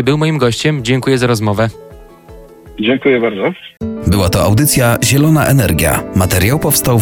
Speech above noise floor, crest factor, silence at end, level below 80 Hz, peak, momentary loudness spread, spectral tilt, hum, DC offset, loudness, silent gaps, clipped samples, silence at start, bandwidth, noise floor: 24 dB; 12 dB; 0 s; -32 dBFS; 0 dBFS; 8 LU; -5 dB/octave; none; under 0.1%; -12 LUFS; none; under 0.1%; 0 s; 17.5 kHz; -36 dBFS